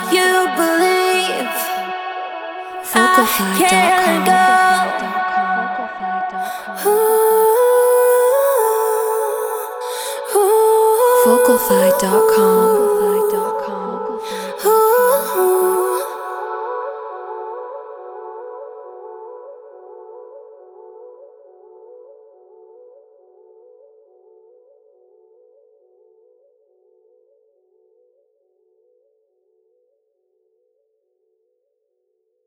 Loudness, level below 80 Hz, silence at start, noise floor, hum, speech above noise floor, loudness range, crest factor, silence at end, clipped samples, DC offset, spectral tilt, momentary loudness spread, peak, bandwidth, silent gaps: -15 LUFS; -62 dBFS; 0 s; -70 dBFS; none; 56 dB; 18 LU; 18 dB; 10.5 s; under 0.1%; under 0.1%; -3 dB/octave; 20 LU; 0 dBFS; over 20 kHz; none